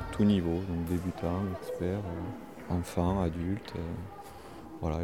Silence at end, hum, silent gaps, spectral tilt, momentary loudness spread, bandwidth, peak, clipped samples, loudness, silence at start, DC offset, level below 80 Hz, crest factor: 0 s; none; none; -7.5 dB/octave; 17 LU; 16.5 kHz; -14 dBFS; under 0.1%; -33 LUFS; 0 s; 0.2%; -46 dBFS; 18 dB